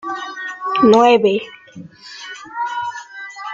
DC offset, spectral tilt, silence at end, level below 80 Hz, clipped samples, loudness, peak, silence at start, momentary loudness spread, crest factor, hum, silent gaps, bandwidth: under 0.1%; -5 dB/octave; 0 s; -62 dBFS; under 0.1%; -16 LUFS; -2 dBFS; 0.05 s; 24 LU; 16 dB; none; none; 7.6 kHz